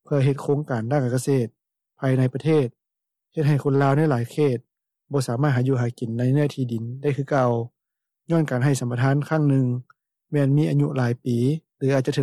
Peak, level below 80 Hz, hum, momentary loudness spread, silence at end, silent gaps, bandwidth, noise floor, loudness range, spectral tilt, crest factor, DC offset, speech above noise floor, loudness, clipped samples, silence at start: -10 dBFS; -66 dBFS; none; 8 LU; 0 s; none; 12.5 kHz; -84 dBFS; 2 LU; -7.5 dB/octave; 12 dB; under 0.1%; 62 dB; -23 LUFS; under 0.1%; 0.1 s